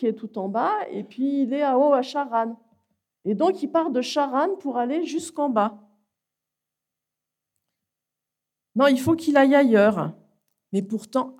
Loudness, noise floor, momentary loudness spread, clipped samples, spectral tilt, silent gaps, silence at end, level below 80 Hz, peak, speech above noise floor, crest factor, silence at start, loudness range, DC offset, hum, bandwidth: -23 LUFS; -86 dBFS; 12 LU; under 0.1%; -6 dB/octave; none; 0.05 s; -70 dBFS; -6 dBFS; 64 dB; 18 dB; 0 s; 8 LU; under 0.1%; 60 Hz at -55 dBFS; 15 kHz